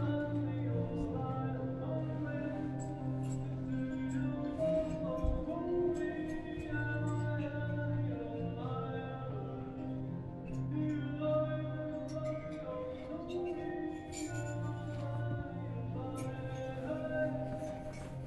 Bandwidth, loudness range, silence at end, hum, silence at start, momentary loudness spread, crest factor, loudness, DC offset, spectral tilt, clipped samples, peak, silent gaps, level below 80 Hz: 11.5 kHz; 4 LU; 0 s; none; 0 s; 7 LU; 16 dB; -38 LUFS; under 0.1%; -8 dB/octave; under 0.1%; -22 dBFS; none; -52 dBFS